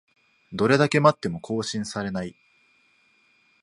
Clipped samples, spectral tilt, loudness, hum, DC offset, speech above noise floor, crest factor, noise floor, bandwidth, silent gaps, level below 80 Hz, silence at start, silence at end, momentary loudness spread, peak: under 0.1%; -5.5 dB/octave; -23 LUFS; none; under 0.1%; 40 dB; 24 dB; -63 dBFS; 11.5 kHz; none; -60 dBFS; 0.5 s; 1.3 s; 14 LU; -2 dBFS